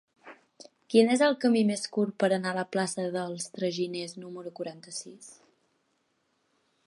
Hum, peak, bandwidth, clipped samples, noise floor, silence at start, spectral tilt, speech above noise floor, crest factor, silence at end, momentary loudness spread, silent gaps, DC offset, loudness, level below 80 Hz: none; -8 dBFS; 11.5 kHz; under 0.1%; -74 dBFS; 0.25 s; -4.5 dB/octave; 46 dB; 22 dB; 1.55 s; 16 LU; none; under 0.1%; -28 LUFS; -82 dBFS